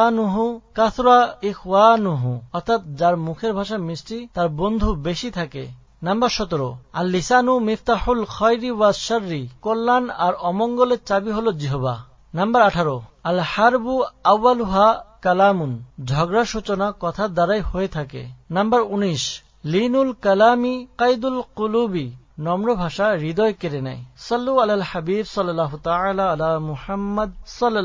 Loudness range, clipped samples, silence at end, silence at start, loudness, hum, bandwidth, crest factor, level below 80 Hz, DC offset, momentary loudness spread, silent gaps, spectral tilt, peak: 4 LU; under 0.1%; 0 s; 0 s; -20 LUFS; none; 7.6 kHz; 20 dB; -40 dBFS; under 0.1%; 11 LU; none; -6 dB/octave; 0 dBFS